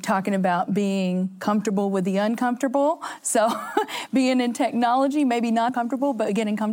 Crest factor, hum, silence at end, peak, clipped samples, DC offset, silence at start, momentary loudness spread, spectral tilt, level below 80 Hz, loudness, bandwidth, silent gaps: 16 dB; none; 0 s; -6 dBFS; under 0.1%; under 0.1%; 0 s; 4 LU; -5 dB/octave; -78 dBFS; -23 LUFS; 17 kHz; none